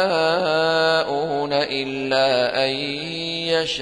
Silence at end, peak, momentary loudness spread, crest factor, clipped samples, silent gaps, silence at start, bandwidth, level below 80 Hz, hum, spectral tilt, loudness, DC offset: 0 s; -6 dBFS; 7 LU; 14 dB; under 0.1%; none; 0 s; 10.5 kHz; -58 dBFS; none; -4 dB/octave; -20 LUFS; under 0.1%